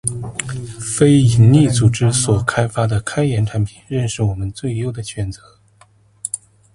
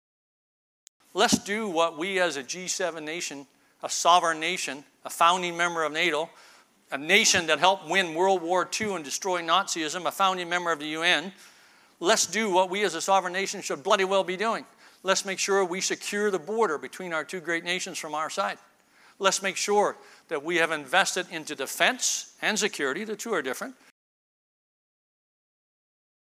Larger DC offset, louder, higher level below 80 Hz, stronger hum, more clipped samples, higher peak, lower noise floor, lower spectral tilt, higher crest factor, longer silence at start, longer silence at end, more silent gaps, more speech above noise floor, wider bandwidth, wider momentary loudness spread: neither; first, -17 LUFS vs -26 LUFS; first, -40 dBFS vs -72 dBFS; neither; neither; first, 0 dBFS vs -4 dBFS; second, -51 dBFS vs -59 dBFS; first, -5.5 dB/octave vs -2 dB/octave; second, 16 dB vs 24 dB; second, 0.05 s vs 1.15 s; second, 0.4 s vs 2.55 s; neither; first, 36 dB vs 32 dB; second, 11.5 kHz vs 15.5 kHz; first, 15 LU vs 11 LU